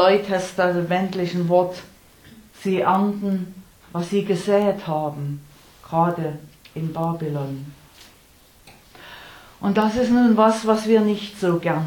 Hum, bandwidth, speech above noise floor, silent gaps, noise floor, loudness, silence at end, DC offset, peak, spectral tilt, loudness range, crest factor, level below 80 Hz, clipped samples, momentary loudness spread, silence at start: none; 18.5 kHz; 32 dB; none; -52 dBFS; -21 LUFS; 0 s; under 0.1%; -4 dBFS; -6.5 dB/octave; 7 LU; 18 dB; -56 dBFS; under 0.1%; 18 LU; 0 s